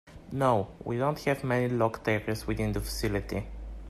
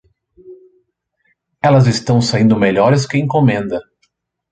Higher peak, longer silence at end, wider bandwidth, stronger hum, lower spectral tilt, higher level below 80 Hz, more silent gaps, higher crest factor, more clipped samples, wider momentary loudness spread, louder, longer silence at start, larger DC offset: second, -12 dBFS vs -2 dBFS; second, 0 s vs 0.7 s; first, 15 kHz vs 9.2 kHz; neither; about the same, -6 dB/octave vs -6.5 dB/octave; first, -44 dBFS vs -50 dBFS; neither; about the same, 18 dB vs 14 dB; neither; about the same, 9 LU vs 8 LU; second, -30 LUFS vs -14 LUFS; second, 0.05 s vs 0.45 s; neither